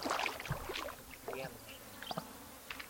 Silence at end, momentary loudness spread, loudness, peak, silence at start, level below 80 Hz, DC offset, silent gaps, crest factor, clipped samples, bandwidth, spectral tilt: 0 s; 13 LU; -43 LUFS; -20 dBFS; 0 s; -60 dBFS; under 0.1%; none; 24 dB; under 0.1%; 17 kHz; -3.5 dB/octave